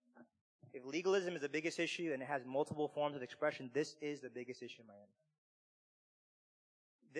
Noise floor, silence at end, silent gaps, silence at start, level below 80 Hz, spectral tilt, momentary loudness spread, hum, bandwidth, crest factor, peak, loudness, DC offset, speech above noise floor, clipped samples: under -90 dBFS; 0 s; 0.41-0.59 s, 5.38-6.99 s; 0.15 s; under -90 dBFS; -4.5 dB/octave; 14 LU; none; 10.5 kHz; 18 dB; -24 dBFS; -41 LUFS; under 0.1%; over 49 dB; under 0.1%